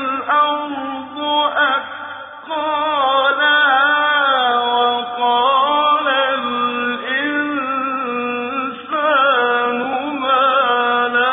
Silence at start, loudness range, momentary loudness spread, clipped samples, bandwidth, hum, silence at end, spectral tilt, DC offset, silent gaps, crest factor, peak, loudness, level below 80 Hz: 0 s; 4 LU; 9 LU; under 0.1%; 3.9 kHz; none; 0 s; -5.5 dB/octave; under 0.1%; none; 12 dB; -4 dBFS; -16 LUFS; -68 dBFS